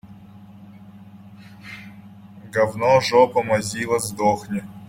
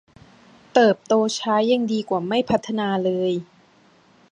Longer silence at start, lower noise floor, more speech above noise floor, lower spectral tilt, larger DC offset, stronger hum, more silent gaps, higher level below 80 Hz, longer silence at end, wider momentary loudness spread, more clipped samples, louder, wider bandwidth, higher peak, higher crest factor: second, 0.05 s vs 0.75 s; second, -44 dBFS vs -55 dBFS; second, 24 dB vs 35 dB; about the same, -4.5 dB/octave vs -5 dB/octave; neither; neither; neither; about the same, -58 dBFS vs -62 dBFS; second, 0.05 s vs 0.9 s; first, 22 LU vs 6 LU; neither; about the same, -20 LUFS vs -21 LUFS; first, 16.5 kHz vs 10 kHz; about the same, -2 dBFS vs -2 dBFS; about the same, 20 dB vs 20 dB